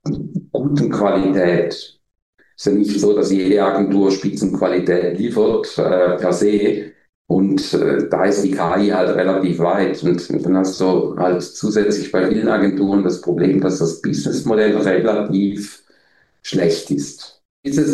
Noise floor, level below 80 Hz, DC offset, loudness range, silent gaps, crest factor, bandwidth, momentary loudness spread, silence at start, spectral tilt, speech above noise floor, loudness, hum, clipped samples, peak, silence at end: -58 dBFS; -52 dBFS; under 0.1%; 2 LU; 2.22-2.33 s, 7.09-7.25 s, 17.45-17.63 s; 14 dB; 12 kHz; 8 LU; 0.05 s; -6 dB/octave; 41 dB; -17 LUFS; none; under 0.1%; -2 dBFS; 0 s